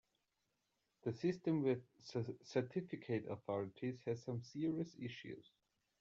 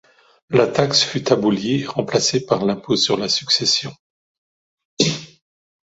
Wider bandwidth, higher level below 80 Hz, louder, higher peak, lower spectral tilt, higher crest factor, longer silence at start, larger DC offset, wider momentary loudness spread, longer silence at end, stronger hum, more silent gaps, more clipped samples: about the same, 7.6 kHz vs 8 kHz; second, -82 dBFS vs -58 dBFS; second, -43 LUFS vs -18 LUFS; second, -26 dBFS vs -2 dBFS; first, -7 dB/octave vs -3.5 dB/octave; about the same, 18 dB vs 20 dB; first, 1.05 s vs 0.5 s; neither; first, 10 LU vs 5 LU; about the same, 0.6 s vs 0.7 s; neither; second, none vs 3.99-4.77 s, 4.85-4.97 s; neither